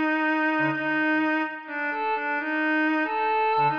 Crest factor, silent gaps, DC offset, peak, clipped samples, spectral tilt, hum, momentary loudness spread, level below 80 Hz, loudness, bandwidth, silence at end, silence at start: 10 dB; none; under 0.1%; -14 dBFS; under 0.1%; -7 dB/octave; none; 5 LU; -78 dBFS; -24 LUFS; 5.4 kHz; 0 s; 0 s